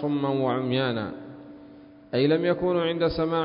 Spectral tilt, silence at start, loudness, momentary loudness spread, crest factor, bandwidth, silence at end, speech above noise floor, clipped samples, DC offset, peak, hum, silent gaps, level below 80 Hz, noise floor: -11 dB/octave; 0 s; -25 LUFS; 19 LU; 16 dB; 5.4 kHz; 0 s; 24 dB; under 0.1%; under 0.1%; -10 dBFS; none; none; -52 dBFS; -48 dBFS